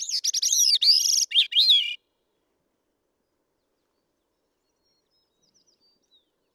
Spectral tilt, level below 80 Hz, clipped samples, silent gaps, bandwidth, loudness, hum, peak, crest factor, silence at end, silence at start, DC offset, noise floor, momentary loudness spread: 8 dB/octave; -90 dBFS; under 0.1%; none; over 20 kHz; -18 LUFS; none; -10 dBFS; 18 dB; 4.6 s; 0 s; under 0.1%; -76 dBFS; 8 LU